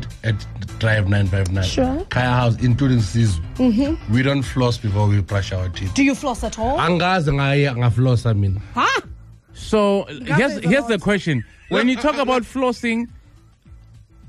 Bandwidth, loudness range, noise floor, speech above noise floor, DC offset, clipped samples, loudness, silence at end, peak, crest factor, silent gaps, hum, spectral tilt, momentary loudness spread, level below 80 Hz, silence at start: 12 kHz; 1 LU; -48 dBFS; 30 dB; under 0.1%; under 0.1%; -19 LUFS; 0 s; -6 dBFS; 12 dB; none; none; -6.5 dB/octave; 6 LU; -36 dBFS; 0 s